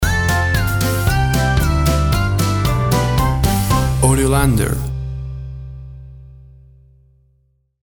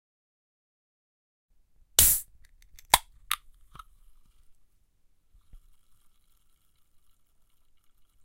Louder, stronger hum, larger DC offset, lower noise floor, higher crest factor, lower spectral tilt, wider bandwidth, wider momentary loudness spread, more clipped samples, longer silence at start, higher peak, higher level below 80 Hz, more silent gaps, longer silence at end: first, -16 LUFS vs -24 LUFS; neither; neither; second, -60 dBFS vs -64 dBFS; second, 16 dB vs 34 dB; first, -5 dB/octave vs 0.5 dB/octave; first, over 20 kHz vs 16 kHz; about the same, 16 LU vs 14 LU; neither; second, 0 s vs 2 s; about the same, 0 dBFS vs 0 dBFS; first, -24 dBFS vs -50 dBFS; neither; second, 1.5 s vs 4.9 s